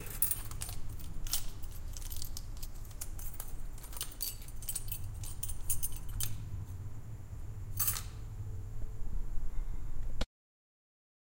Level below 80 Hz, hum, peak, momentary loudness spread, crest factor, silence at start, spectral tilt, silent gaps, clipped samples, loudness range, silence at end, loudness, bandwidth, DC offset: -40 dBFS; none; -10 dBFS; 14 LU; 26 dB; 0 s; -2.5 dB/octave; none; under 0.1%; 5 LU; 1 s; -40 LUFS; 17 kHz; under 0.1%